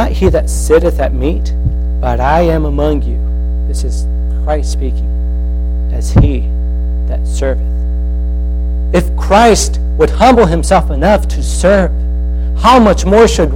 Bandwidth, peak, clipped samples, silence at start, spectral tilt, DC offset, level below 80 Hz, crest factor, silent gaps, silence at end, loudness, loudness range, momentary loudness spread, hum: 12.5 kHz; 0 dBFS; under 0.1%; 0 s; -6 dB/octave; under 0.1%; -14 dBFS; 10 dB; none; 0 s; -12 LUFS; 5 LU; 10 LU; none